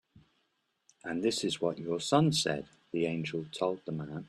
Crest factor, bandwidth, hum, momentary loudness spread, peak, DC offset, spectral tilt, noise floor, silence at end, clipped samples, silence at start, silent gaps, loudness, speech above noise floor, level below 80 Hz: 20 dB; 13 kHz; none; 12 LU; -12 dBFS; under 0.1%; -5 dB/octave; -78 dBFS; 0 s; under 0.1%; 1.05 s; none; -32 LUFS; 46 dB; -68 dBFS